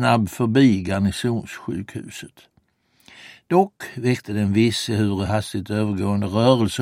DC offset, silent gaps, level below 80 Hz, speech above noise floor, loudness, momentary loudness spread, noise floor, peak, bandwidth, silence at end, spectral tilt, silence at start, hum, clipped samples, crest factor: under 0.1%; none; -52 dBFS; 43 dB; -21 LUFS; 13 LU; -63 dBFS; -2 dBFS; 16 kHz; 0 s; -6 dB/octave; 0 s; none; under 0.1%; 18 dB